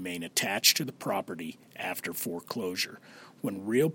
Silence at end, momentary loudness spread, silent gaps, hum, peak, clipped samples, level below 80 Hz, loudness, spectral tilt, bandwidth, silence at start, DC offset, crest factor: 0 s; 16 LU; none; none; -6 dBFS; under 0.1%; -76 dBFS; -30 LUFS; -2.5 dB/octave; 17 kHz; 0 s; under 0.1%; 26 dB